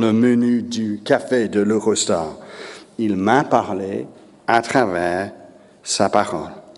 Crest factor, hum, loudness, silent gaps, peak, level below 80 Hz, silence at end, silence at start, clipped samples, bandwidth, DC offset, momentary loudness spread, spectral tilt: 20 dB; none; -19 LUFS; none; 0 dBFS; -58 dBFS; 0.05 s; 0 s; under 0.1%; 11.5 kHz; under 0.1%; 15 LU; -4.5 dB/octave